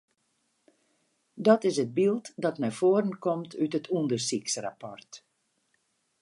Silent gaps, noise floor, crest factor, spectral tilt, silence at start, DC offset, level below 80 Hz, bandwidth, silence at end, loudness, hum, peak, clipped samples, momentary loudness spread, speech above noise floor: none; -75 dBFS; 22 dB; -5 dB/octave; 1.35 s; under 0.1%; -80 dBFS; 11.5 kHz; 1.05 s; -28 LUFS; none; -8 dBFS; under 0.1%; 10 LU; 47 dB